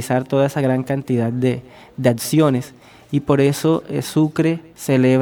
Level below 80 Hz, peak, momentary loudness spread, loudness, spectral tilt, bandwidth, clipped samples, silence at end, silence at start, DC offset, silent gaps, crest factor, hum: -54 dBFS; 0 dBFS; 8 LU; -19 LUFS; -6.5 dB/octave; 19 kHz; under 0.1%; 0 s; 0 s; under 0.1%; none; 18 dB; none